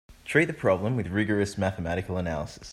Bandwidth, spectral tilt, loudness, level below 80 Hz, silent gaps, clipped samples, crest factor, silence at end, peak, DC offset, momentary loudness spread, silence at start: 13.5 kHz; -6.5 dB/octave; -27 LUFS; -52 dBFS; none; under 0.1%; 20 dB; 0 s; -8 dBFS; under 0.1%; 7 LU; 0.1 s